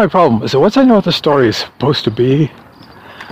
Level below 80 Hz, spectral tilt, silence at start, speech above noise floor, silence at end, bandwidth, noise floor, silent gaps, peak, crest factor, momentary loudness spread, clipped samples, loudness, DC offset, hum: -46 dBFS; -6.5 dB/octave; 0 s; 26 dB; 0 s; 15.5 kHz; -37 dBFS; none; 0 dBFS; 12 dB; 6 LU; under 0.1%; -12 LUFS; under 0.1%; none